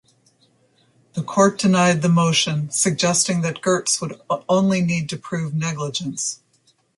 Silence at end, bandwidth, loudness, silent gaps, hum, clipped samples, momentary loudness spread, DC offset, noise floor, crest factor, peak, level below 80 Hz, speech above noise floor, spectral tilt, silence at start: 0.6 s; 11.5 kHz; -20 LUFS; none; none; under 0.1%; 10 LU; under 0.1%; -62 dBFS; 18 dB; -2 dBFS; -60 dBFS; 42 dB; -4 dB/octave; 1.15 s